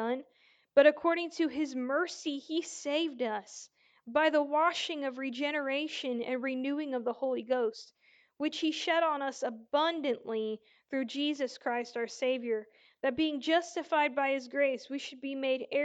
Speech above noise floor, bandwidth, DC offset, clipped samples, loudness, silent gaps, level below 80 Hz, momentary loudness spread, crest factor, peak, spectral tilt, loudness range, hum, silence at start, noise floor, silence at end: 35 dB; 9.2 kHz; under 0.1%; under 0.1%; -32 LUFS; none; -78 dBFS; 9 LU; 22 dB; -10 dBFS; -2.5 dB/octave; 3 LU; none; 0 s; -67 dBFS; 0 s